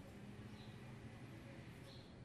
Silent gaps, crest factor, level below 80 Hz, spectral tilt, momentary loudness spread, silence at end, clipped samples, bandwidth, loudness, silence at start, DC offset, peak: none; 12 dB; -68 dBFS; -6 dB/octave; 1 LU; 0 s; under 0.1%; 13 kHz; -56 LUFS; 0 s; under 0.1%; -42 dBFS